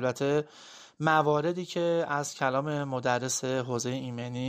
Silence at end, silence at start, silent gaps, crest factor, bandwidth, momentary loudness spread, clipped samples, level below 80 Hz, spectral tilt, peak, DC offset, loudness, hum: 0 s; 0 s; none; 20 dB; 15.5 kHz; 10 LU; under 0.1%; -70 dBFS; -4.5 dB/octave; -10 dBFS; under 0.1%; -29 LUFS; none